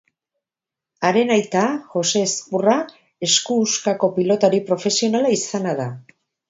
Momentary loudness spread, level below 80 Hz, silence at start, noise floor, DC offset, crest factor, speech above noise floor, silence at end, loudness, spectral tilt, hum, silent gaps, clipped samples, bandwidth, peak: 7 LU; -68 dBFS; 1 s; -88 dBFS; under 0.1%; 18 dB; 69 dB; 0.5 s; -19 LUFS; -3.5 dB/octave; none; none; under 0.1%; 8 kHz; -2 dBFS